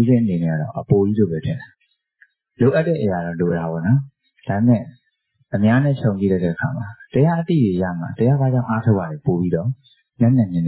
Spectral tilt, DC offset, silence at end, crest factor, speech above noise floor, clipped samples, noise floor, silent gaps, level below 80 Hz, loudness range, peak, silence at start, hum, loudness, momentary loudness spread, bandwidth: -13 dB/octave; under 0.1%; 0 s; 16 dB; 48 dB; under 0.1%; -66 dBFS; none; -46 dBFS; 2 LU; -4 dBFS; 0 s; none; -19 LUFS; 9 LU; 4 kHz